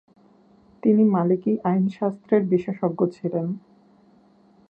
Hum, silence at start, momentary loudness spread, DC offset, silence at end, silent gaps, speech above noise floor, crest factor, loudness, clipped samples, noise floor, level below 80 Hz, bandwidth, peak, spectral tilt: none; 0.85 s; 10 LU; under 0.1%; 1.1 s; none; 35 dB; 18 dB; -22 LUFS; under 0.1%; -56 dBFS; -68 dBFS; 5 kHz; -6 dBFS; -11 dB/octave